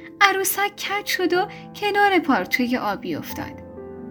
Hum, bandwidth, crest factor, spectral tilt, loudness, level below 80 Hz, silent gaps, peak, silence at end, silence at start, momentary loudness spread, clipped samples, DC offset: none; over 20 kHz; 22 dB; -2.5 dB/octave; -21 LUFS; -60 dBFS; none; 0 dBFS; 0 s; 0 s; 16 LU; under 0.1%; under 0.1%